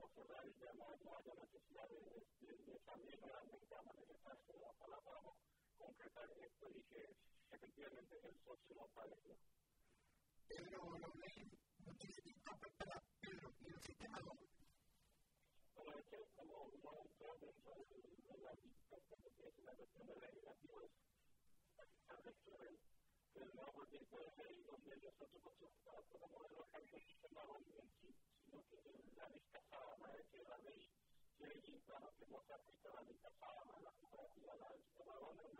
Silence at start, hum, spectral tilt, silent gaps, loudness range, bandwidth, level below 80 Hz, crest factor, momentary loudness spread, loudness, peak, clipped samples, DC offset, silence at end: 0 s; none; -5 dB/octave; none; 6 LU; 15.5 kHz; -82 dBFS; 26 dB; 8 LU; -62 LUFS; -36 dBFS; under 0.1%; under 0.1%; 0 s